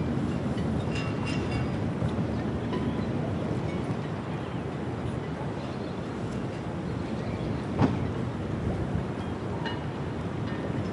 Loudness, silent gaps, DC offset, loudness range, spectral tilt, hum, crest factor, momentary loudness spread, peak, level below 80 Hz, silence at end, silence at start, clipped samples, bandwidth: -31 LUFS; none; under 0.1%; 3 LU; -7.5 dB/octave; none; 20 dB; 4 LU; -10 dBFS; -46 dBFS; 0 s; 0 s; under 0.1%; 11 kHz